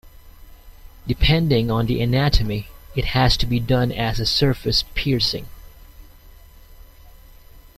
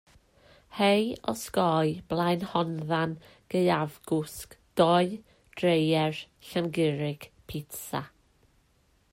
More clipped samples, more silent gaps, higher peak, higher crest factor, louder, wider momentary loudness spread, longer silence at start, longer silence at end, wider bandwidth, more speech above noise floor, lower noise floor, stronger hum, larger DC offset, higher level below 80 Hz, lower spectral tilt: neither; neither; first, -2 dBFS vs -8 dBFS; about the same, 20 dB vs 20 dB; first, -20 LUFS vs -28 LUFS; second, 10 LU vs 16 LU; second, 0.05 s vs 0.7 s; second, 0.15 s vs 1.05 s; about the same, 15.5 kHz vs 16 kHz; second, 26 dB vs 39 dB; second, -45 dBFS vs -67 dBFS; neither; neither; first, -30 dBFS vs -62 dBFS; about the same, -5.5 dB/octave vs -6 dB/octave